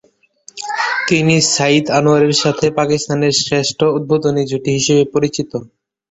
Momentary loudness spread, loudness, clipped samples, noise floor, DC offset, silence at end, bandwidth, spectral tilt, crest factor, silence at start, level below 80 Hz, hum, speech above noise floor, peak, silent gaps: 10 LU; -14 LUFS; under 0.1%; -46 dBFS; under 0.1%; 0.45 s; 8.2 kHz; -4 dB/octave; 14 dB; 0.55 s; -52 dBFS; none; 31 dB; 0 dBFS; none